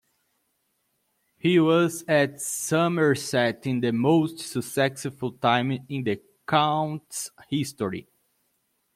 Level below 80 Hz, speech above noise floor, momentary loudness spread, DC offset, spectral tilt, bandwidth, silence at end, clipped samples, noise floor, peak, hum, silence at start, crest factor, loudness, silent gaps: -68 dBFS; 49 dB; 10 LU; under 0.1%; -5 dB/octave; 16 kHz; 0.95 s; under 0.1%; -73 dBFS; -6 dBFS; none; 1.45 s; 20 dB; -25 LUFS; none